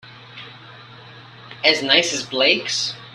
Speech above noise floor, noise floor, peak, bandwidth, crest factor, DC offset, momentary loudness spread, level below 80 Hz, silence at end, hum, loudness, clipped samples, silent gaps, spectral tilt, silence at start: 23 dB; -42 dBFS; -2 dBFS; 13.5 kHz; 22 dB; under 0.1%; 23 LU; -66 dBFS; 0 s; none; -17 LUFS; under 0.1%; none; -1.5 dB/octave; 0.05 s